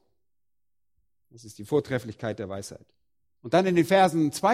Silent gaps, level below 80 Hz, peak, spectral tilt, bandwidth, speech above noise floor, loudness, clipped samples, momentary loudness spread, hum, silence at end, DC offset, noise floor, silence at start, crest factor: none; -66 dBFS; -8 dBFS; -5.5 dB/octave; 16 kHz; 64 dB; -25 LUFS; under 0.1%; 20 LU; none; 0 s; under 0.1%; -89 dBFS; 1.45 s; 20 dB